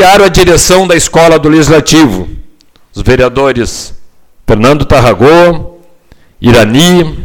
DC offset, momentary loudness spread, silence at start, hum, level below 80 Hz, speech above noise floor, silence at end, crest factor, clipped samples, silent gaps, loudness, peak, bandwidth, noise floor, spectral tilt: under 0.1%; 13 LU; 0 s; none; -22 dBFS; 34 dB; 0 s; 6 dB; 3%; none; -6 LUFS; 0 dBFS; 19 kHz; -39 dBFS; -4.5 dB/octave